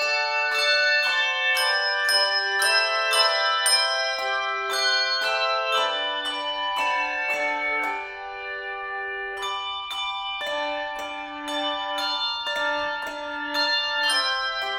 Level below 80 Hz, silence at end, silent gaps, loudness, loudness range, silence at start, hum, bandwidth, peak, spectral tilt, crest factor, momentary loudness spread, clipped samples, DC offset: -62 dBFS; 0 s; none; -23 LUFS; 8 LU; 0 s; none; 16.5 kHz; -6 dBFS; 1 dB/octave; 18 dB; 11 LU; under 0.1%; under 0.1%